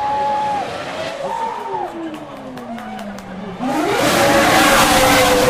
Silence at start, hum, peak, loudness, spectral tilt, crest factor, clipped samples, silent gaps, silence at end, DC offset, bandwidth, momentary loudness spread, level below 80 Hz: 0 s; none; 0 dBFS; -15 LUFS; -3 dB/octave; 16 dB; under 0.1%; none; 0 s; under 0.1%; 16 kHz; 19 LU; -38 dBFS